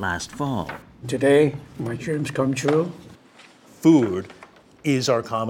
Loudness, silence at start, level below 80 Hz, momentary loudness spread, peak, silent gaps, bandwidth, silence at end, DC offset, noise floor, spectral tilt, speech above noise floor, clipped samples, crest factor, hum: -22 LUFS; 0 s; -56 dBFS; 14 LU; -4 dBFS; none; 16.5 kHz; 0 s; under 0.1%; -50 dBFS; -6 dB/octave; 29 dB; under 0.1%; 18 dB; none